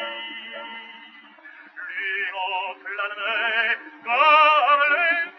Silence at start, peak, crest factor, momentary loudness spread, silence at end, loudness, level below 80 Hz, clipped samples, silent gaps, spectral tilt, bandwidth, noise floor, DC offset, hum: 0 s; -6 dBFS; 18 dB; 21 LU; 0.05 s; -20 LUFS; under -90 dBFS; under 0.1%; none; 4.5 dB/octave; 6.2 kHz; -46 dBFS; under 0.1%; none